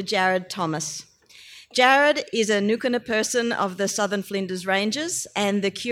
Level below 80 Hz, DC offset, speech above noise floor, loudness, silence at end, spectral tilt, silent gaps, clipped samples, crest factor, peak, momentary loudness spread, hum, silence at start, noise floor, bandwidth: -68 dBFS; under 0.1%; 25 dB; -23 LUFS; 0 s; -3 dB/octave; none; under 0.1%; 20 dB; -4 dBFS; 10 LU; none; 0 s; -48 dBFS; 16.5 kHz